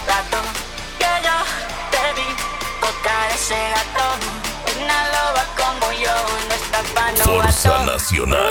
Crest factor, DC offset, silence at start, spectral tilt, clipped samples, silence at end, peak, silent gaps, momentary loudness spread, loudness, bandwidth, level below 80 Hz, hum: 18 dB; under 0.1%; 0 s; -2.5 dB/octave; under 0.1%; 0 s; -2 dBFS; none; 8 LU; -18 LUFS; 19 kHz; -30 dBFS; none